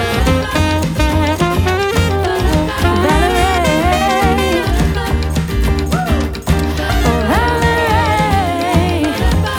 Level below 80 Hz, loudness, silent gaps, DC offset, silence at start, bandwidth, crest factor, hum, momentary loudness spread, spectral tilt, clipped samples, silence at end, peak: -20 dBFS; -14 LUFS; none; under 0.1%; 0 s; 19.5 kHz; 12 dB; none; 4 LU; -5.5 dB/octave; under 0.1%; 0 s; 0 dBFS